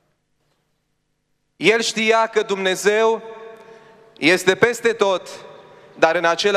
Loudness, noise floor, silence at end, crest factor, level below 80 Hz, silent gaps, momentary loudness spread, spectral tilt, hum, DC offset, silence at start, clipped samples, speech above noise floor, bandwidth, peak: -18 LUFS; -70 dBFS; 0 s; 20 dB; -72 dBFS; none; 11 LU; -3 dB/octave; 50 Hz at -55 dBFS; under 0.1%; 1.6 s; under 0.1%; 52 dB; 15.5 kHz; 0 dBFS